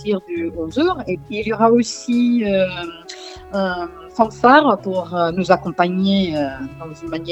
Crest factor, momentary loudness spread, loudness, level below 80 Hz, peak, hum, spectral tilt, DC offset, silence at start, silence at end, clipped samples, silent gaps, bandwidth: 18 dB; 15 LU; -18 LUFS; -48 dBFS; 0 dBFS; none; -5.5 dB/octave; under 0.1%; 0 s; 0 s; under 0.1%; none; 8.4 kHz